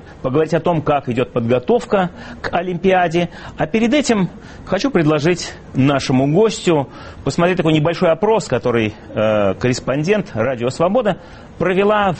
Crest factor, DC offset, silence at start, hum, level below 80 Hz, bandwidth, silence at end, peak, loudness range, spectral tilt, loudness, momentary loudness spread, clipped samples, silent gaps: 14 dB; under 0.1%; 0.05 s; none; -42 dBFS; 8.8 kHz; 0 s; -2 dBFS; 2 LU; -6 dB/octave; -17 LUFS; 8 LU; under 0.1%; none